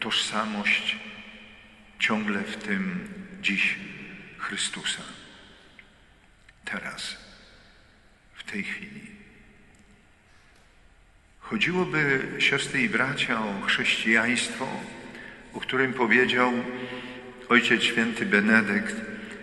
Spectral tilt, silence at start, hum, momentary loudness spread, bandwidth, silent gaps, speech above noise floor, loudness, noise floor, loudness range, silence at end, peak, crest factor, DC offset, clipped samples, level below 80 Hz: -3.5 dB/octave; 0 s; none; 20 LU; 11.5 kHz; none; 31 dB; -25 LUFS; -57 dBFS; 16 LU; 0 s; -6 dBFS; 22 dB; under 0.1%; under 0.1%; -60 dBFS